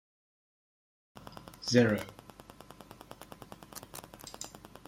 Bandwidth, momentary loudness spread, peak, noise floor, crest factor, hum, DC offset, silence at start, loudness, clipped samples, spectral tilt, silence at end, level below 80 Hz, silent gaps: 16.5 kHz; 26 LU; -10 dBFS; -54 dBFS; 26 dB; 50 Hz at -60 dBFS; under 0.1%; 1.3 s; -32 LUFS; under 0.1%; -5 dB/octave; 0.3 s; -64 dBFS; none